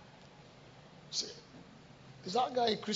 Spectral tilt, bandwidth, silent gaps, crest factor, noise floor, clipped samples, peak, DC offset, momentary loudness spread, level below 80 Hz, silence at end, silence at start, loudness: -2.5 dB/octave; 7.6 kHz; none; 22 dB; -57 dBFS; under 0.1%; -16 dBFS; under 0.1%; 24 LU; -72 dBFS; 0 s; 0 s; -35 LUFS